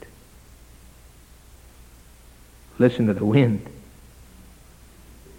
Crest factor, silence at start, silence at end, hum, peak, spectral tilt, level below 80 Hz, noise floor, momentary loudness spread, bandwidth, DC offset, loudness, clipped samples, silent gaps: 22 dB; 2.8 s; 1.6 s; none; -4 dBFS; -8 dB/octave; -50 dBFS; -49 dBFS; 27 LU; 17 kHz; under 0.1%; -21 LUFS; under 0.1%; none